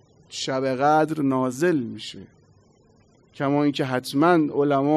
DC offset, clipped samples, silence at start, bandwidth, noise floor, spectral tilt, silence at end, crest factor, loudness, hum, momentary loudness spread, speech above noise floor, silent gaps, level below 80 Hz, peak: under 0.1%; under 0.1%; 0.3 s; 13.5 kHz; -57 dBFS; -6 dB/octave; 0 s; 16 dB; -22 LUFS; none; 15 LU; 36 dB; none; -68 dBFS; -8 dBFS